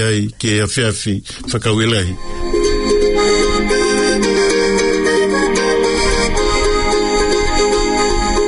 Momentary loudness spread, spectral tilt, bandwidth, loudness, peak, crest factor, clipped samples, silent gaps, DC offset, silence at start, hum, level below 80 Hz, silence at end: 5 LU; -4 dB/octave; 11 kHz; -15 LUFS; -2 dBFS; 12 dB; under 0.1%; none; under 0.1%; 0 s; none; -24 dBFS; 0 s